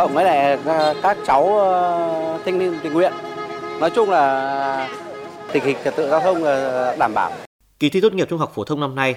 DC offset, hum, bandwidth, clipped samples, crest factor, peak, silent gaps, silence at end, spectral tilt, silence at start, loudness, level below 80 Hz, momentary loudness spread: under 0.1%; none; 16 kHz; under 0.1%; 16 dB; -2 dBFS; 7.46-7.59 s; 0 s; -5.5 dB/octave; 0 s; -19 LUFS; -60 dBFS; 11 LU